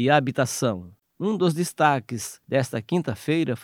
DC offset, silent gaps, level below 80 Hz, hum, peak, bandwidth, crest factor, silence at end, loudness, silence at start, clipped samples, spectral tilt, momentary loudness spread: under 0.1%; none; -66 dBFS; none; -4 dBFS; 17.5 kHz; 20 dB; 0 s; -24 LUFS; 0 s; under 0.1%; -5.5 dB/octave; 9 LU